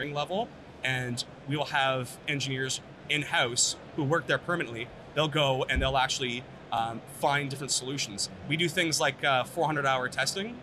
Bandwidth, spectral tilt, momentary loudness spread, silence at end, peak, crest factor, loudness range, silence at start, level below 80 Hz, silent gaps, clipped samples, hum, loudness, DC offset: 14 kHz; -3 dB/octave; 8 LU; 0 s; -12 dBFS; 18 dB; 2 LU; 0 s; -50 dBFS; none; under 0.1%; none; -29 LUFS; under 0.1%